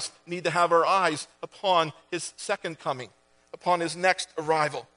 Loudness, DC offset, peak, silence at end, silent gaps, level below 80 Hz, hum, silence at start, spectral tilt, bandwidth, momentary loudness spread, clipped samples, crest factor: -26 LUFS; under 0.1%; -6 dBFS; 0.15 s; none; -74 dBFS; none; 0 s; -3.5 dB/octave; 10.5 kHz; 12 LU; under 0.1%; 22 dB